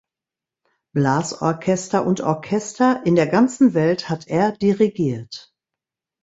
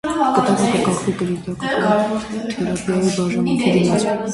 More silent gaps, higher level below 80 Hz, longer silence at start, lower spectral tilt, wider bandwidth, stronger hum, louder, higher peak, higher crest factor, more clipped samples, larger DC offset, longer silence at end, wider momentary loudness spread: neither; second, -58 dBFS vs -48 dBFS; first, 0.95 s vs 0.05 s; about the same, -6 dB/octave vs -5.5 dB/octave; second, 8 kHz vs 11.5 kHz; neither; about the same, -19 LUFS vs -18 LUFS; about the same, -4 dBFS vs -2 dBFS; about the same, 16 dB vs 16 dB; neither; neither; first, 0.8 s vs 0 s; about the same, 8 LU vs 7 LU